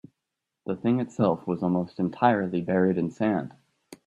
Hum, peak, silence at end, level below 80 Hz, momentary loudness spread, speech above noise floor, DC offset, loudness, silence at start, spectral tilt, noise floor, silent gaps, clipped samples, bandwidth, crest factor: none; -6 dBFS; 0.1 s; -66 dBFS; 8 LU; 59 dB; under 0.1%; -26 LUFS; 0.65 s; -8.5 dB/octave; -84 dBFS; none; under 0.1%; 9.4 kHz; 20 dB